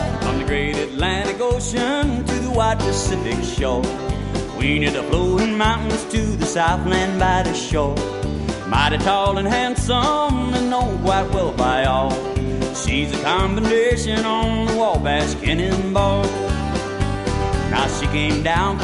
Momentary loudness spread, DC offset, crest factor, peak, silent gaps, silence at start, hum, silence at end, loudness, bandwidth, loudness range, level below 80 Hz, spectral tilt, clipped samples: 5 LU; under 0.1%; 16 dB; -2 dBFS; none; 0 s; none; 0 s; -20 LUFS; 11.5 kHz; 2 LU; -28 dBFS; -5 dB/octave; under 0.1%